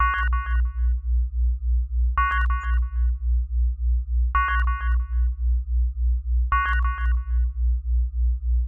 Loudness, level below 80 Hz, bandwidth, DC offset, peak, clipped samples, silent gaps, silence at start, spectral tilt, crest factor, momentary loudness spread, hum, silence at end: -25 LUFS; -22 dBFS; 3.3 kHz; under 0.1%; -10 dBFS; under 0.1%; none; 0 s; -6.5 dB/octave; 12 dB; 4 LU; none; 0 s